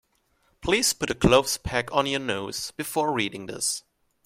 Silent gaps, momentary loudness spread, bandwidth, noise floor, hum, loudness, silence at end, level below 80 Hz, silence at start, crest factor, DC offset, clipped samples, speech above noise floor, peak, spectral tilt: none; 11 LU; 16 kHz; -68 dBFS; none; -25 LUFS; 0.45 s; -44 dBFS; 0.6 s; 22 dB; under 0.1%; under 0.1%; 43 dB; -4 dBFS; -3 dB/octave